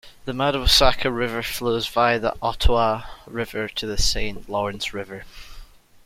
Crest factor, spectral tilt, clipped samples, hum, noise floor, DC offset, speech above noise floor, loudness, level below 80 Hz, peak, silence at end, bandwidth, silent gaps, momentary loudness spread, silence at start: 20 dB; -3.5 dB/octave; under 0.1%; none; -43 dBFS; under 0.1%; 21 dB; -22 LUFS; -30 dBFS; -2 dBFS; 0.4 s; 16.5 kHz; none; 16 LU; 0.05 s